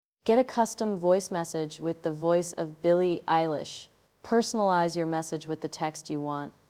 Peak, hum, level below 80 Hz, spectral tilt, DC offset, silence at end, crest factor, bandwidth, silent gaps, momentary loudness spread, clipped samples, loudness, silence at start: -12 dBFS; none; -70 dBFS; -5.5 dB/octave; under 0.1%; 0.2 s; 16 dB; 16 kHz; none; 9 LU; under 0.1%; -28 LUFS; 0.25 s